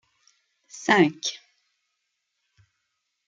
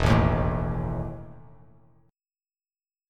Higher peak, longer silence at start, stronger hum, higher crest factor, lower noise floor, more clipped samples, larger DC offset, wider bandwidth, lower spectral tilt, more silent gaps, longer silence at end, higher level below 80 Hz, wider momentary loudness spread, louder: about the same, -4 dBFS vs -6 dBFS; first, 0.75 s vs 0 s; neither; about the same, 24 dB vs 22 dB; second, -78 dBFS vs under -90 dBFS; neither; neither; second, 9 kHz vs 10.5 kHz; second, -4 dB/octave vs -7.5 dB/octave; neither; first, 1.9 s vs 1.7 s; second, -76 dBFS vs -36 dBFS; first, 25 LU vs 20 LU; first, -23 LUFS vs -27 LUFS